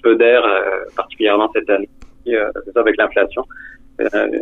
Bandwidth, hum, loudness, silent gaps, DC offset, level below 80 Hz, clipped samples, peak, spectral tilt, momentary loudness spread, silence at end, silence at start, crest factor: 4.1 kHz; none; -16 LUFS; none; under 0.1%; -46 dBFS; under 0.1%; -2 dBFS; -5.5 dB/octave; 19 LU; 0 s; 0.05 s; 14 dB